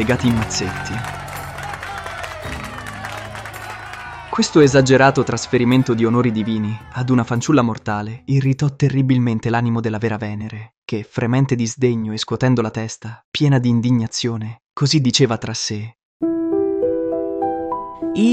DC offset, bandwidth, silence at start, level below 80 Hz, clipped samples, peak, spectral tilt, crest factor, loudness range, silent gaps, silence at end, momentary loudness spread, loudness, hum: under 0.1%; 14 kHz; 0 s; -46 dBFS; under 0.1%; -2 dBFS; -5.5 dB/octave; 18 dB; 7 LU; 10.77-10.82 s, 13.24-13.32 s, 14.66-14.70 s, 16.05-16.20 s; 0 s; 14 LU; -19 LUFS; none